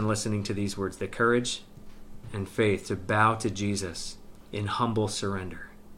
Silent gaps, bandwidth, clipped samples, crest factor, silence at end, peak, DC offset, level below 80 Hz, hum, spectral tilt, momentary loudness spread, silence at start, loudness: none; 15.5 kHz; under 0.1%; 20 dB; 0 s; -8 dBFS; under 0.1%; -50 dBFS; none; -5 dB/octave; 16 LU; 0 s; -29 LUFS